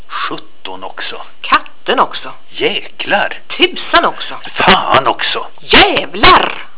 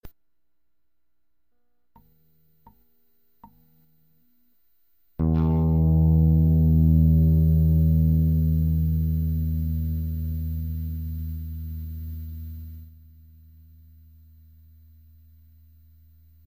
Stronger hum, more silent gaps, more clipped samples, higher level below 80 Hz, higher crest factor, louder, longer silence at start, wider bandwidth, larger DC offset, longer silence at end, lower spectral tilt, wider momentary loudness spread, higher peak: neither; neither; first, 1% vs under 0.1%; about the same, -34 dBFS vs -30 dBFS; about the same, 14 dB vs 14 dB; first, -11 LUFS vs -22 LUFS; about the same, 0.1 s vs 0.05 s; second, 4 kHz vs 15.5 kHz; first, 7% vs under 0.1%; second, 0.1 s vs 3.6 s; second, -7.5 dB/octave vs -12.5 dB/octave; about the same, 18 LU vs 17 LU; first, 0 dBFS vs -10 dBFS